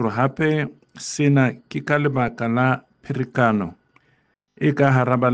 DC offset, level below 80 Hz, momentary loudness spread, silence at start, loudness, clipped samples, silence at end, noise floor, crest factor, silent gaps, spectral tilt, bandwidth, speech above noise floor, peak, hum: under 0.1%; -58 dBFS; 13 LU; 0 s; -21 LUFS; under 0.1%; 0 s; -64 dBFS; 18 dB; none; -7 dB/octave; 9.4 kHz; 45 dB; -4 dBFS; none